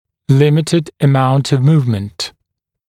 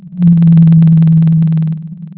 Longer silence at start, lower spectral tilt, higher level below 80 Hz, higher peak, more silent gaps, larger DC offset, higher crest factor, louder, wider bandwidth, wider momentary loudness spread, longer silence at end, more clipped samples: first, 0.3 s vs 0.05 s; second, -7 dB/octave vs -13.5 dB/octave; second, -54 dBFS vs -40 dBFS; about the same, 0 dBFS vs 0 dBFS; neither; neither; first, 14 dB vs 8 dB; second, -14 LUFS vs -8 LUFS; first, 12.5 kHz vs 3 kHz; about the same, 11 LU vs 10 LU; first, 0.6 s vs 0.1 s; neither